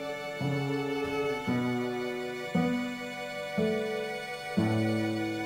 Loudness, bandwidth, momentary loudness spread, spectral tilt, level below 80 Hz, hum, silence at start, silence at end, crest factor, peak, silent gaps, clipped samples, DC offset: -32 LUFS; 17 kHz; 7 LU; -6.5 dB/octave; -64 dBFS; none; 0 s; 0 s; 16 dB; -16 dBFS; none; under 0.1%; under 0.1%